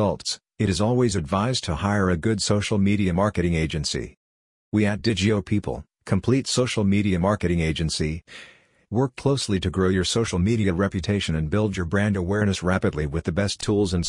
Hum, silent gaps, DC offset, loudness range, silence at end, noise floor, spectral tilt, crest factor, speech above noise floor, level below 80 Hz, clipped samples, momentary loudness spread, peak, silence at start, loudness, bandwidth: none; 4.17-4.72 s; under 0.1%; 2 LU; 0 s; under -90 dBFS; -5.5 dB/octave; 16 dB; over 68 dB; -44 dBFS; under 0.1%; 6 LU; -6 dBFS; 0 s; -23 LUFS; 11 kHz